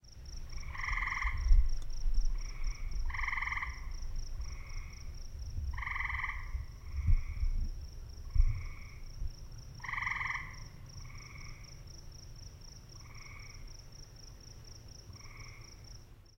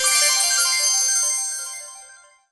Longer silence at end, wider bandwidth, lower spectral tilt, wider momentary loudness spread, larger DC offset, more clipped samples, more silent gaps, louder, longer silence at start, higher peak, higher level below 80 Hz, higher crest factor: second, 0.15 s vs 0.35 s; second, 6.4 kHz vs 11 kHz; first, -4 dB/octave vs 5 dB/octave; about the same, 17 LU vs 16 LU; neither; neither; neither; second, -39 LUFS vs -17 LUFS; about the same, 0.05 s vs 0 s; second, -14 dBFS vs -6 dBFS; first, -36 dBFS vs -70 dBFS; first, 22 dB vs 16 dB